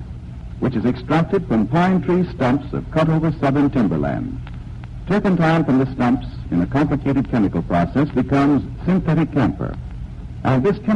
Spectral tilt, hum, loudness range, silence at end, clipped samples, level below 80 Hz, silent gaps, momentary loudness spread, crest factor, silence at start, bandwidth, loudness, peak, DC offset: -9 dB/octave; none; 1 LU; 0 s; under 0.1%; -36 dBFS; none; 15 LU; 12 dB; 0 s; 8.6 kHz; -19 LUFS; -6 dBFS; under 0.1%